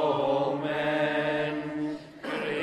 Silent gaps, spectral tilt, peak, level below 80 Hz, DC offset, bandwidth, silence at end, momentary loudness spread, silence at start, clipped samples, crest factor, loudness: none; -6.5 dB/octave; -14 dBFS; -66 dBFS; under 0.1%; 12 kHz; 0 s; 9 LU; 0 s; under 0.1%; 14 dB; -29 LUFS